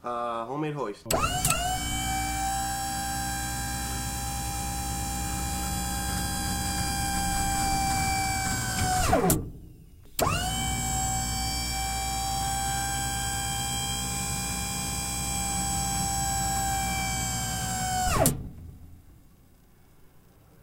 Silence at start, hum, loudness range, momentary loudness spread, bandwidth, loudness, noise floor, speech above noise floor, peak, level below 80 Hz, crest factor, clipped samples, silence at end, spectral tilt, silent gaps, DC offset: 0.05 s; none; 3 LU; 6 LU; 16 kHz; -28 LUFS; -56 dBFS; 30 dB; -8 dBFS; -38 dBFS; 22 dB; under 0.1%; 0 s; -3 dB/octave; none; under 0.1%